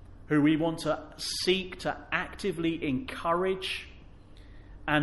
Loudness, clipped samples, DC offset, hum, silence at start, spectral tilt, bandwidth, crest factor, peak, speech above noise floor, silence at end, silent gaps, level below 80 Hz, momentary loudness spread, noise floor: -30 LUFS; under 0.1%; under 0.1%; none; 0 s; -5 dB/octave; 11.5 kHz; 20 dB; -10 dBFS; 20 dB; 0 s; none; -50 dBFS; 9 LU; -50 dBFS